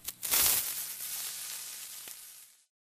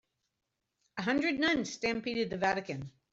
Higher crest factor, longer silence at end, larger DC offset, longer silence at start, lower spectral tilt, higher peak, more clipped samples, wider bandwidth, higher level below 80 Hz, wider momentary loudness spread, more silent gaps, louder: first, 30 dB vs 18 dB; about the same, 0.35 s vs 0.25 s; neither; second, 0 s vs 0.95 s; second, 1.5 dB/octave vs -4.5 dB/octave; first, -6 dBFS vs -16 dBFS; neither; first, 16 kHz vs 8 kHz; about the same, -64 dBFS vs -66 dBFS; first, 20 LU vs 12 LU; neither; about the same, -30 LUFS vs -32 LUFS